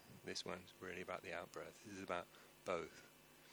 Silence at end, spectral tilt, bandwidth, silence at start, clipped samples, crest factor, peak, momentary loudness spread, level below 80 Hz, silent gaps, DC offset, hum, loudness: 0 s; -3.5 dB/octave; over 20 kHz; 0 s; under 0.1%; 24 dB; -28 dBFS; 13 LU; -80 dBFS; none; under 0.1%; none; -49 LUFS